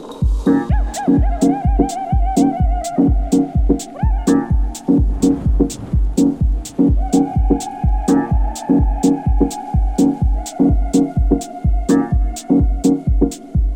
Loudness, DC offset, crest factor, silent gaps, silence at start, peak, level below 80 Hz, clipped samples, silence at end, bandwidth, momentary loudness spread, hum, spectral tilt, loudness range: -17 LUFS; under 0.1%; 14 dB; none; 0 s; 0 dBFS; -18 dBFS; under 0.1%; 0 s; 15.5 kHz; 5 LU; none; -7.5 dB/octave; 1 LU